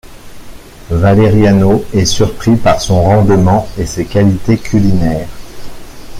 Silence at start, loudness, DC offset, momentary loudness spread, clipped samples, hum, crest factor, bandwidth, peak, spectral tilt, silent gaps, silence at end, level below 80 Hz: 0.1 s; -11 LUFS; under 0.1%; 9 LU; under 0.1%; none; 10 dB; 15.5 kHz; 0 dBFS; -6.5 dB/octave; none; 0 s; -28 dBFS